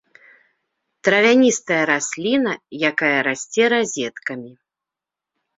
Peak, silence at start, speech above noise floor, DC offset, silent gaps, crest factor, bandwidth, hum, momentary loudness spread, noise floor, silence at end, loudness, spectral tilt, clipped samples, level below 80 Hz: -2 dBFS; 1.05 s; 68 dB; under 0.1%; none; 18 dB; 8 kHz; none; 12 LU; -87 dBFS; 1.05 s; -18 LUFS; -3 dB/octave; under 0.1%; -66 dBFS